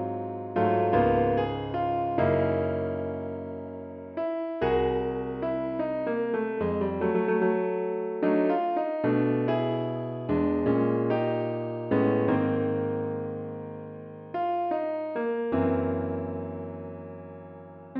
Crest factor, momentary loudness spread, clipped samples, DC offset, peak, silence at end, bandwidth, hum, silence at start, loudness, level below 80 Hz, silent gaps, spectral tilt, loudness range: 16 dB; 13 LU; under 0.1%; under 0.1%; -12 dBFS; 0 s; 5.4 kHz; none; 0 s; -28 LUFS; -52 dBFS; none; -7 dB/octave; 4 LU